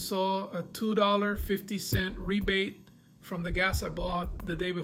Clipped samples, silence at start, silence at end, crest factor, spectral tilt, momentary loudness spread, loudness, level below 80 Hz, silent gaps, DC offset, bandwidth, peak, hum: under 0.1%; 0 s; 0 s; 18 dB; -5 dB/octave; 10 LU; -31 LUFS; -42 dBFS; none; under 0.1%; 18 kHz; -14 dBFS; none